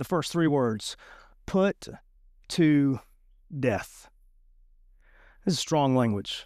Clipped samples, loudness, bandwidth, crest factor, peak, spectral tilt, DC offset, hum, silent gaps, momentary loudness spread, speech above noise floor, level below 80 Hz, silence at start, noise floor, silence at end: under 0.1%; -27 LUFS; 15 kHz; 16 dB; -12 dBFS; -6 dB/octave; under 0.1%; none; none; 18 LU; 32 dB; -56 dBFS; 0 s; -58 dBFS; 0 s